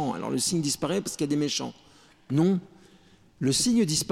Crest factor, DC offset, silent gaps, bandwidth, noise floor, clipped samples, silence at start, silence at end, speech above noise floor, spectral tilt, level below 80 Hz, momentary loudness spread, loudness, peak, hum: 14 dB; under 0.1%; none; 16 kHz; -57 dBFS; under 0.1%; 0 s; 0 s; 31 dB; -4.5 dB/octave; -58 dBFS; 8 LU; -26 LUFS; -14 dBFS; none